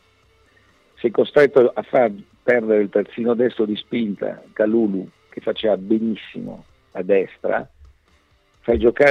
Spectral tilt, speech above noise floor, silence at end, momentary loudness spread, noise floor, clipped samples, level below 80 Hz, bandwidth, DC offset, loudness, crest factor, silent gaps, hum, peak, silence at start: -7.5 dB/octave; 40 dB; 0 s; 15 LU; -59 dBFS; under 0.1%; -48 dBFS; 6.6 kHz; under 0.1%; -20 LUFS; 16 dB; none; none; -4 dBFS; 1.05 s